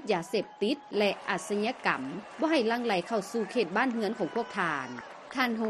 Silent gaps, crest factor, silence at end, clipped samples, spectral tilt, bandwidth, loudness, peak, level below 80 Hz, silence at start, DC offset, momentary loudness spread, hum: none; 20 dB; 0 s; under 0.1%; -4.5 dB/octave; 13 kHz; -30 LUFS; -10 dBFS; -74 dBFS; 0 s; under 0.1%; 6 LU; none